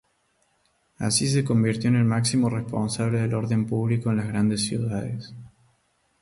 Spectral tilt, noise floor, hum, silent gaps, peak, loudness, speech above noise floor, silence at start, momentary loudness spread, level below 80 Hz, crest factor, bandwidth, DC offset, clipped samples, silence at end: -5.5 dB/octave; -68 dBFS; none; none; -10 dBFS; -24 LUFS; 45 dB; 1 s; 8 LU; -54 dBFS; 16 dB; 11.5 kHz; under 0.1%; under 0.1%; 0.75 s